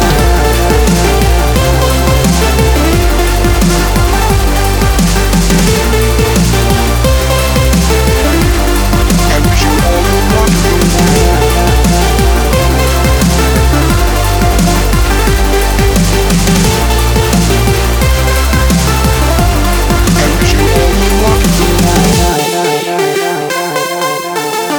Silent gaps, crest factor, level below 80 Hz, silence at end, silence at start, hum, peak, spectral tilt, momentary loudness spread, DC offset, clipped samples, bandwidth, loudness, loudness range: none; 8 dB; -12 dBFS; 0 s; 0 s; none; 0 dBFS; -4.5 dB/octave; 2 LU; under 0.1%; under 0.1%; over 20 kHz; -10 LUFS; 1 LU